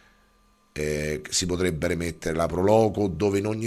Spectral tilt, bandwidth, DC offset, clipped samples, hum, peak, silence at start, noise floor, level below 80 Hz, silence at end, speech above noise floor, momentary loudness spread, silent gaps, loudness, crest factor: -5 dB/octave; 14.5 kHz; under 0.1%; under 0.1%; none; -6 dBFS; 0.75 s; -61 dBFS; -44 dBFS; 0 s; 38 dB; 8 LU; none; -25 LUFS; 20 dB